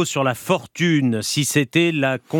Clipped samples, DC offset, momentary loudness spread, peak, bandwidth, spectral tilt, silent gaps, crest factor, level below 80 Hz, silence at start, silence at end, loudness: under 0.1%; under 0.1%; 4 LU; -2 dBFS; 19 kHz; -4.5 dB/octave; none; 18 dB; -66 dBFS; 0 s; 0 s; -19 LUFS